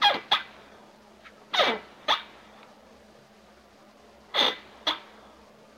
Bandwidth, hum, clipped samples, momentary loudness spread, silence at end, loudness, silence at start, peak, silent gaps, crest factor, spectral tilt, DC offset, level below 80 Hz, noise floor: 16 kHz; none; under 0.1%; 10 LU; 0.75 s; -26 LUFS; 0 s; -8 dBFS; none; 24 dB; -1 dB/octave; under 0.1%; -70 dBFS; -55 dBFS